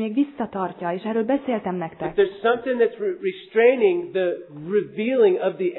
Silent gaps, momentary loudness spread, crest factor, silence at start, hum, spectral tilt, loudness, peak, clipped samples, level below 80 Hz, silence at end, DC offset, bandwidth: none; 9 LU; 16 dB; 0 s; none; -10.5 dB/octave; -22 LUFS; -4 dBFS; under 0.1%; -62 dBFS; 0 s; under 0.1%; 4.2 kHz